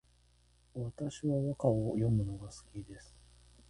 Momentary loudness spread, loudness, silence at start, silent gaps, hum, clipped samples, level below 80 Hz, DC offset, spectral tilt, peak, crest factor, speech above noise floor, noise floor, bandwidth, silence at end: 17 LU; -35 LUFS; 0.75 s; none; 60 Hz at -55 dBFS; under 0.1%; -56 dBFS; under 0.1%; -8.5 dB/octave; -16 dBFS; 20 dB; 33 dB; -67 dBFS; 11 kHz; 0.65 s